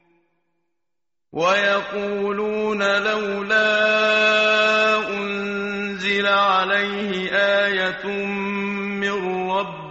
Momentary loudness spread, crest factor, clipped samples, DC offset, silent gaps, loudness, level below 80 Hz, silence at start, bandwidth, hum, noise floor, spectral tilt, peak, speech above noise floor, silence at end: 9 LU; 16 dB; under 0.1%; under 0.1%; none; -20 LUFS; -60 dBFS; 1.35 s; 8 kHz; none; -86 dBFS; -1.5 dB/octave; -4 dBFS; 66 dB; 0 s